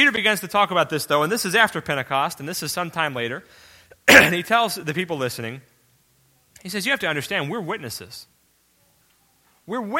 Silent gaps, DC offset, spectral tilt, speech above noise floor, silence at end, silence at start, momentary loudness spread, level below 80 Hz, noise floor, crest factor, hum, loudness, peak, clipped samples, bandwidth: none; under 0.1%; -3 dB/octave; 41 dB; 0 s; 0 s; 18 LU; -58 dBFS; -62 dBFS; 22 dB; none; -20 LUFS; 0 dBFS; under 0.1%; 17 kHz